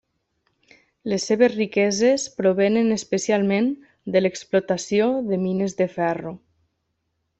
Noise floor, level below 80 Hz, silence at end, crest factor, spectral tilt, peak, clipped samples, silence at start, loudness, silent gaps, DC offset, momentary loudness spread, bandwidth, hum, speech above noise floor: -74 dBFS; -64 dBFS; 1 s; 18 dB; -5 dB/octave; -4 dBFS; under 0.1%; 1.05 s; -22 LUFS; none; under 0.1%; 7 LU; 8.4 kHz; none; 54 dB